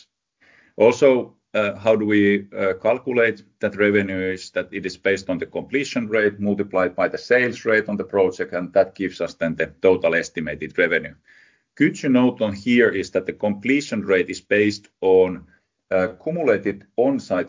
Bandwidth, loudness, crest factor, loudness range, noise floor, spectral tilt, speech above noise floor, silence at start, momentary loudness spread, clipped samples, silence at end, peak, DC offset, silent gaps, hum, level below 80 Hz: 7.6 kHz; -21 LUFS; 18 dB; 3 LU; -60 dBFS; -6 dB/octave; 40 dB; 0.8 s; 9 LU; under 0.1%; 0 s; -2 dBFS; under 0.1%; none; none; -56 dBFS